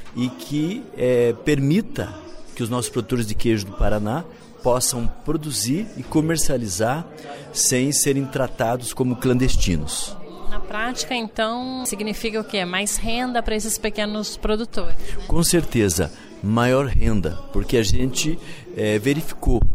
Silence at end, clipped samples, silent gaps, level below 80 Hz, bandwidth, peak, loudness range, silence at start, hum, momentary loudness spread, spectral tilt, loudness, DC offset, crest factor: 0 s; under 0.1%; none; -30 dBFS; 16 kHz; -6 dBFS; 3 LU; 0 s; none; 11 LU; -4.5 dB/octave; -22 LUFS; under 0.1%; 14 dB